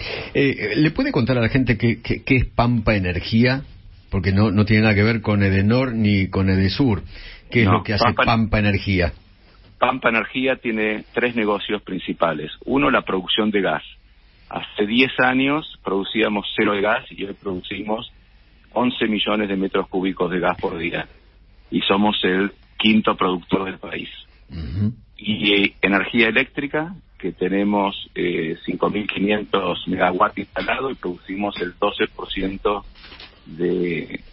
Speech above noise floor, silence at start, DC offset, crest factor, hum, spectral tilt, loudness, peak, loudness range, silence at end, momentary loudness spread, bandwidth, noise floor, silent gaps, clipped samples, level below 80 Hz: 31 dB; 0 s; under 0.1%; 20 dB; none; -10.5 dB/octave; -20 LUFS; 0 dBFS; 4 LU; 0.05 s; 11 LU; 5.8 kHz; -51 dBFS; none; under 0.1%; -40 dBFS